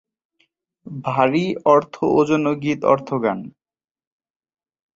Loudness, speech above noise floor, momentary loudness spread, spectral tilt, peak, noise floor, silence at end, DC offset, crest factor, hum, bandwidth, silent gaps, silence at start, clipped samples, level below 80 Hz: -19 LUFS; 48 dB; 13 LU; -7 dB/octave; -2 dBFS; -67 dBFS; 1.45 s; under 0.1%; 20 dB; none; 7.8 kHz; none; 0.85 s; under 0.1%; -60 dBFS